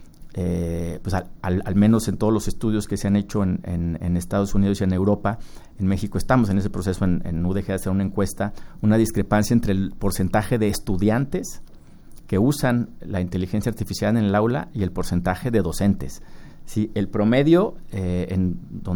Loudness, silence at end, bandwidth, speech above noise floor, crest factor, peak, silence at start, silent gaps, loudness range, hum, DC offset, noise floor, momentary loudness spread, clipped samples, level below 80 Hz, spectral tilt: -23 LUFS; 0 s; over 20 kHz; 20 dB; 18 dB; -4 dBFS; 0 s; none; 2 LU; none; under 0.1%; -41 dBFS; 8 LU; under 0.1%; -36 dBFS; -7 dB/octave